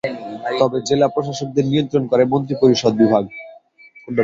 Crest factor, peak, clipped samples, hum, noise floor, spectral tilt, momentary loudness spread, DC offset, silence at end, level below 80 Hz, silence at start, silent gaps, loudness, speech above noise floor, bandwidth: 16 dB; -2 dBFS; under 0.1%; none; -47 dBFS; -6 dB/octave; 11 LU; under 0.1%; 0 s; -56 dBFS; 0.05 s; none; -18 LUFS; 30 dB; 7.8 kHz